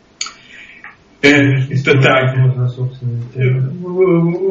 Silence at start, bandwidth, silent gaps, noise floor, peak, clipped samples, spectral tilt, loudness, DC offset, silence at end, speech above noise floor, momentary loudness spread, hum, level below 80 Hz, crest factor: 0.2 s; 7.6 kHz; none; -39 dBFS; 0 dBFS; under 0.1%; -5.5 dB/octave; -13 LUFS; under 0.1%; 0 s; 26 dB; 14 LU; none; -50 dBFS; 14 dB